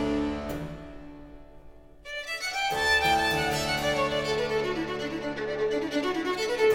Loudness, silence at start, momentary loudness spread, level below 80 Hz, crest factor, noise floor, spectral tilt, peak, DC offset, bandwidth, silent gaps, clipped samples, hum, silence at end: -27 LUFS; 0 s; 17 LU; -48 dBFS; 16 dB; -48 dBFS; -3.5 dB/octave; -12 dBFS; under 0.1%; 16.5 kHz; none; under 0.1%; none; 0 s